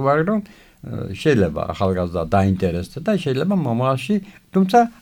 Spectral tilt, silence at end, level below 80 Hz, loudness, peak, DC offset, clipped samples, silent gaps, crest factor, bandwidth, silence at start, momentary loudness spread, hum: -7.5 dB/octave; 0.1 s; -44 dBFS; -20 LUFS; -2 dBFS; under 0.1%; under 0.1%; none; 18 dB; 18 kHz; 0 s; 9 LU; none